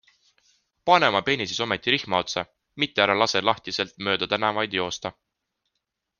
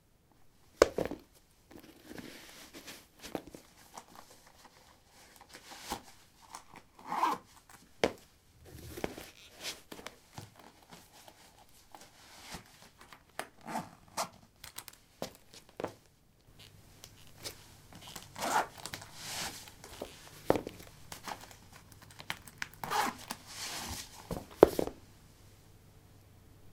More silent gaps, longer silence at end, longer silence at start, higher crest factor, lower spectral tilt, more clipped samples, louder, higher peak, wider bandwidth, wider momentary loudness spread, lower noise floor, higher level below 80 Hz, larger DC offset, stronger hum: neither; first, 1.1 s vs 0 s; first, 0.85 s vs 0.4 s; second, 24 dB vs 38 dB; about the same, -3.5 dB/octave vs -3.5 dB/octave; neither; first, -23 LUFS vs -37 LUFS; about the same, -2 dBFS vs -2 dBFS; second, 10 kHz vs 17.5 kHz; second, 11 LU vs 23 LU; first, -81 dBFS vs -65 dBFS; about the same, -64 dBFS vs -62 dBFS; neither; neither